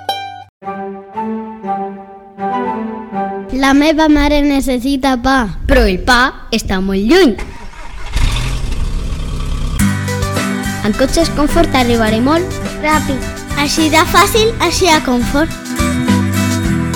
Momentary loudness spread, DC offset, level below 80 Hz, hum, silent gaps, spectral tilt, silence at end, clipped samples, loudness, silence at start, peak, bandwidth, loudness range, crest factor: 13 LU; under 0.1%; -22 dBFS; none; 0.49-0.61 s; -4.5 dB/octave; 0 s; under 0.1%; -14 LUFS; 0 s; 0 dBFS; 19 kHz; 6 LU; 14 dB